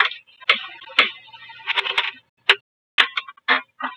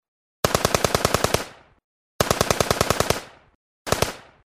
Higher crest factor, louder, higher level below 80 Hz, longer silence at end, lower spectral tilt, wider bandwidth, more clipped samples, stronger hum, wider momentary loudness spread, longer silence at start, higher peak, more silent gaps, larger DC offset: about the same, 24 dB vs 24 dB; about the same, -20 LUFS vs -22 LUFS; second, -74 dBFS vs -40 dBFS; second, 0 s vs 0.25 s; second, 0 dB/octave vs -3.5 dB/octave; about the same, 16 kHz vs 16 kHz; neither; neither; first, 9 LU vs 6 LU; second, 0 s vs 0.45 s; about the same, 0 dBFS vs -2 dBFS; second, 2.29-2.37 s, 2.61-2.98 s vs 1.84-2.19 s, 3.55-3.85 s; neither